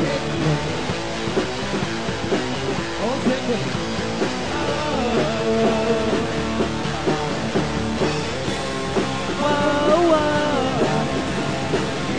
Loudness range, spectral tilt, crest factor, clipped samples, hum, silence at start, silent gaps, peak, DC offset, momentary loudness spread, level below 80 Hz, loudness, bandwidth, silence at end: 3 LU; -5 dB/octave; 16 dB; under 0.1%; none; 0 s; none; -6 dBFS; 2%; 6 LU; -40 dBFS; -22 LUFS; 10.5 kHz; 0 s